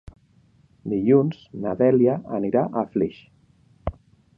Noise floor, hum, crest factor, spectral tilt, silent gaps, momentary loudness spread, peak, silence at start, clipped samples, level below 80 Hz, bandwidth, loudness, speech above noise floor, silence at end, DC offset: -58 dBFS; none; 18 dB; -11 dB/octave; none; 16 LU; -6 dBFS; 0.85 s; under 0.1%; -48 dBFS; 5.4 kHz; -22 LUFS; 37 dB; 0.45 s; under 0.1%